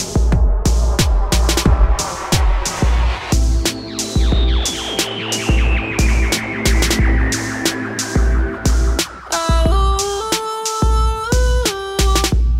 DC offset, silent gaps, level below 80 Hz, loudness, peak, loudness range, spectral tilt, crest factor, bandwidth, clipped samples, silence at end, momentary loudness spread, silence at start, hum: under 0.1%; none; -16 dBFS; -17 LUFS; -2 dBFS; 1 LU; -4 dB/octave; 14 dB; 16 kHz; under 0.1%; 0 s; 4 LU; 0 s; none